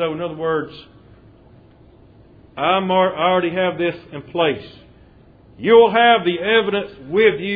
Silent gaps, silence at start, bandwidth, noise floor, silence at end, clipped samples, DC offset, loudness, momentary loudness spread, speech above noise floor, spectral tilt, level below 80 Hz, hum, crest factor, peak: none; 0 s; 4.9 kHz; -48 dBFS; 0 s; under 0.1%; under 0.1%; -17 LUFS; 14 LU; 30 dB; -8.5 dB/octave; -54 dBFS; none; 18 dB; 0 dBFS